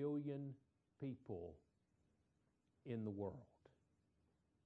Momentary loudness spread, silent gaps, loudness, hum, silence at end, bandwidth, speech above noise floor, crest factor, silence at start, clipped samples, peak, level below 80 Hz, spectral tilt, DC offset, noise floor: 15 LU; none; -50 LUFS; none; 1.2 s; 4.3 kHz; 34 dB; 18 dB; 0 s; under 0.1%; -34 dBFS; -80 dBFS; -9.5 dB/octave; under 0.1%; -83 dBFS